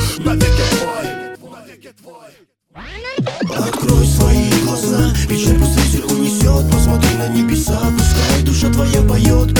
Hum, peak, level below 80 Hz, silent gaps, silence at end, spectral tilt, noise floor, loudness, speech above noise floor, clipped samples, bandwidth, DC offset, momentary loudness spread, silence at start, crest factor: none; 0 dBFS; -18 dBFS; none; 0 s; -5 dB/octave; -38 dBFS; -14 LUFS; 24 dB; under 0.1%; over 20 kHz; under 0.1%; 9 LU; 0 s; 14 dB